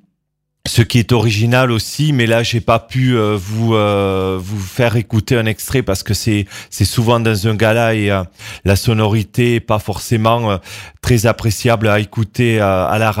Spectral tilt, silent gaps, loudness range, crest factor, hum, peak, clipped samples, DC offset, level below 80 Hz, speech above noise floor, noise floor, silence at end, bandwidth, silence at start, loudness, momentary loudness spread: -5.5 dB/octave; none; 2 LU; 14 dB; none; 0 dBFS; under 0.1%; under 0.1%; -38 dBFS; 57 dB; -71 dBFS; 0 s; 16.5 kHz; 0.65 s; -15 LUFS; 6 LU